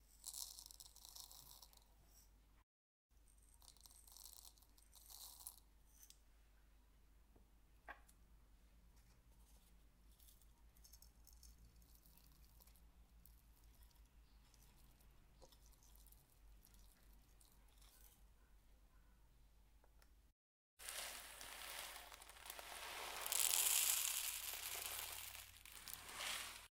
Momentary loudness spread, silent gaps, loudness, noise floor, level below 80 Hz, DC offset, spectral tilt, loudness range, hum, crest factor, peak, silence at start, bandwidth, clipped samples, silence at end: 29 LU; 2.63-3.09 s, 20.32-20.77 s; -44 LUFS; -70 dBFS; -70 dBFS; under 0.1%; 1 dB/octave; 28 LU; none; 34 dB; -20 dBFS; 0 s; 17.5 kHz; under 0.1%; 0.1 s